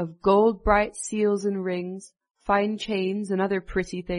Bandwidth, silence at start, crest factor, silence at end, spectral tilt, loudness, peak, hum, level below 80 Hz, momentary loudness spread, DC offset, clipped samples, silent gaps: 10.5 kHz; 0 s; 18 dB; 0 s; -5.5 dB/octave; -24 LUFS; -6 dBFS; none; -44 dBFS; 10 LU; under 0.1%; under 0.1%; 2.31-2.35 s